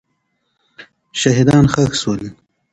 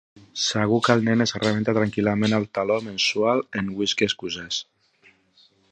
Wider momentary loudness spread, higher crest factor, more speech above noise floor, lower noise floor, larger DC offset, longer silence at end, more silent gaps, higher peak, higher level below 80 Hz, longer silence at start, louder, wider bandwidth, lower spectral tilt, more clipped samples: first, 14 LU vs 9 LU; about the same, 18 dB vs 22 dB; first, 54 dB vs 37 dB; first, -68 dBFS vs -59 dBFS; neither; second, 0.4 s vs 1.1 s; neither; about the same, 0 dBFS vs -2 dBFS; first, -42 dBFS vs -58 dBFS; first, 0.8 s vs 0.35 s; first, -15 LUFS vs -23 LUFS; first, 11 kHz vs 9.6 kHz; about the same, -5.5 dB/octave vs -4.5 dB/octave; neither